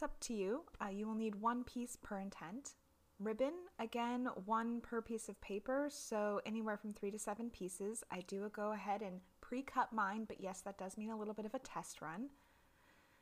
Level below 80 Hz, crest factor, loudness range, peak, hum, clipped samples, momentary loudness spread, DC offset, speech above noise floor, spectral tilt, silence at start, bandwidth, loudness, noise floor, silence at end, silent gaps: -68 dBFS; 20 dB; 2 LU; -24 dBFS; none; under 0.1%; 8 LU; under 0.1%; 27 dB; -4.5 dB/octave; 0 s; 15.5 kHz; -44 LUFS; -71 dBFS; 0.9 s; none